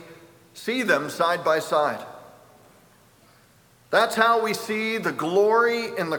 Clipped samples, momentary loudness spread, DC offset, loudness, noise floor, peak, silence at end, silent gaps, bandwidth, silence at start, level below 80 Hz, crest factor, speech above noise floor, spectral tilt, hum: under 0.1%; 8 LU; under 0.1%; -22 LUFS; -57 dBFS; -4 dBFS; 0 s; none; over 20 kHz; 0 s; -72 dBFS; 20 dB; 34 dB; -4 dB/octave; none